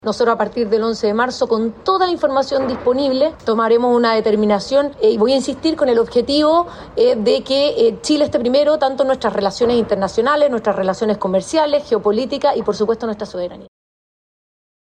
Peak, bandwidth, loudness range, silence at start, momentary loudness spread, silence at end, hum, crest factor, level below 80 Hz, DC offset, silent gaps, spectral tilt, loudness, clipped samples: -6 dBFS; 10.5 kHz; 3 LU; 0.05 s; 4 LU; 1.3 s; none; 12 dB; -50 dBFS; under 0.1%; none; -5 dB/octave; -16 LUFS; under 0.1%